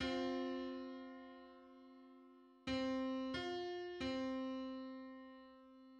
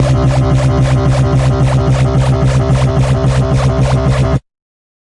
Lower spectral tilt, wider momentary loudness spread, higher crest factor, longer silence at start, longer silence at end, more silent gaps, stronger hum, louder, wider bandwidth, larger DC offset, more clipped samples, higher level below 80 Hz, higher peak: second, -5 dB/octave vs -7.5 dB/octave; first, 20 LU vs 1 LU; first, 16 dB vs 10 dB; about the same, 0 s vs 0 s; second, 0 s vs 0.65 s; neither; neither; second, -44 LUFS vs -12 LUFS; second, 9 kHz vs 11 kHz; neither; neither; second, -70 dBFS vs -20 dBFS; second, -30 dBFS vs 0 dBFS